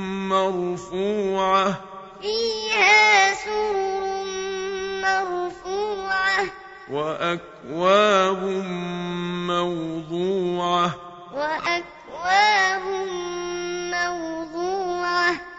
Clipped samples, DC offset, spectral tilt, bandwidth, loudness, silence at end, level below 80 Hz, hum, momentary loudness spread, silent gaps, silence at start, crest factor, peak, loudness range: under 0.1%; under 0.1%; -3.5 dB/octave; 8 kHz; -22 LUFS; 0 s; -56 dBFS; none; 12 LU; none; 0 s; 18 dB; -4 dBFS; 6 LU